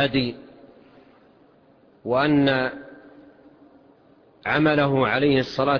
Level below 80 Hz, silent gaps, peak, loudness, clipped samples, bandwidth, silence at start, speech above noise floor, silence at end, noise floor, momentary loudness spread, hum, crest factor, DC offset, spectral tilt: -56 dBFS; none; -8 dBFS; -21 LUFS; under 0.1%; 5.4 kHz; 0 s; 35 dB; 0 s; -56 dBFS; 16 LU; none; 16 dB; under 0.1%; -7.5 dB/octave